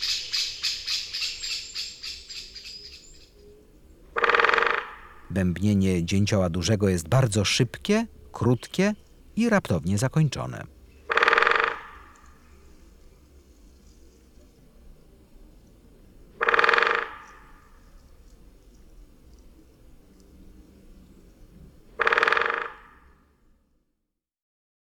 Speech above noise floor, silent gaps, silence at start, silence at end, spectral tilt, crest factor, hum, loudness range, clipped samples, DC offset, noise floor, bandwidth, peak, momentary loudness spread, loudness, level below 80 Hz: 57 dB; none; 0 s; 2.15 s; -4.5 dB/octave; 28 dB; none; 7 LU; under 0.1%; under 0.1%; -81 dBFS; 16.5 kHz; 0 dBFS; 18 LU; -24 LUFS; -52 dBFS